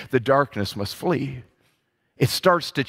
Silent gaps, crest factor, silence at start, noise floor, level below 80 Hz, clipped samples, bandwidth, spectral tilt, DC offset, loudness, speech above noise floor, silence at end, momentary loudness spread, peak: none; 20 dB; 0 s; -69 dBFS; -56 dBFS; under 0.1%; 16 kHz; -5.5 dB/octave; under 0.1%; -23 LUFS; 47 dB; 0 s; 9 LU; -4 dBFS